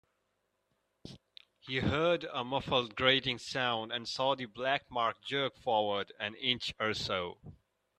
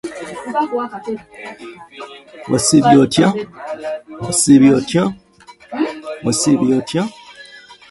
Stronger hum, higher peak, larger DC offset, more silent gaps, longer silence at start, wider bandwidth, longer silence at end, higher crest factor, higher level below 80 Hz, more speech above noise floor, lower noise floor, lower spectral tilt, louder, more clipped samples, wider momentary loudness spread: neither; second, -12 dBFS vs 0 dBFS; neither; neither; first, 1.05 s vs 0.05 s; about the same, 11.5 kHz vs 11.5 kHz; first, 0.45 s vs 0.2 s; first, 22 dB vs 16 dB; second, -64 dBFS vs -52 dBFS; first, 47 dB vs 28 dB; first, -80 dBFS vs -44 dBFS; about the same, -4.5 dB/octave vs -4.5 dB/octave; second, -33 LUFS vs -15 LUFS; neither; second, 10 LU vs 24 LU